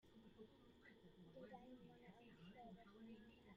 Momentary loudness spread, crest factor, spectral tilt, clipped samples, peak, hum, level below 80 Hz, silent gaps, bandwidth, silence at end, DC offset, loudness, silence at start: 6 LU; 16 dB; -5 dB/octave; under 0.1%; -48 dBFS; none; -80 dBFS; none; 7.2 kHz; 0 s; under 0.1%; -65 LUFS; 0 s